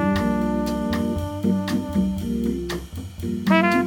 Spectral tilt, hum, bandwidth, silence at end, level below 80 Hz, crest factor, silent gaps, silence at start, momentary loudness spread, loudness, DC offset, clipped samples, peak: -6.5 dB/octave; none; 17.5 kHz; 0 s; -38 dBFS; 20 dB; none; 0 s; 10 LU; -23 LUFS; under 0.1%; under 0.1%; -4 dBFS